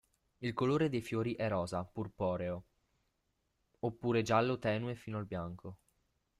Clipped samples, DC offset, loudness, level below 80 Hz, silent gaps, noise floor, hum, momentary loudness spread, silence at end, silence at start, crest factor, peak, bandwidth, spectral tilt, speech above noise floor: under 0.1%; under 0.1%; -36 LUFS; -66 dBFS; none; -81 dBFS; none; 12 LU; 0.65 s; 0.4 s; 20 dB; -18 dBFS; 13 kHz; -7 dB/octave; 46 dB